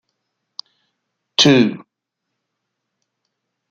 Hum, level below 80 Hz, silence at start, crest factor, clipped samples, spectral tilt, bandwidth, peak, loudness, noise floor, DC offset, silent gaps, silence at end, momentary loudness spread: none; -62 dBFS; 1.4 s; 20 dB; under 0.1%; -4 dB/octave; 7.8 kHz; -2 dBFS; -14 LUFS; -79 dBFS; under 0.1%; none; 1.9 s; 24 LU